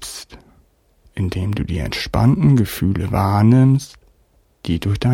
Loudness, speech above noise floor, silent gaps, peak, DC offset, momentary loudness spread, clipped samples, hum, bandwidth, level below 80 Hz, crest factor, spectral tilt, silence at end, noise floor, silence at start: -17 LUFS; 42 dB; none; -2 dBFS; under 0.1%; 18 LU; under 0.1%; none; 17 kHz; -36 dBFS; 16 dB; -7 dB/octave; 0 s; -57 dBFS; 0 s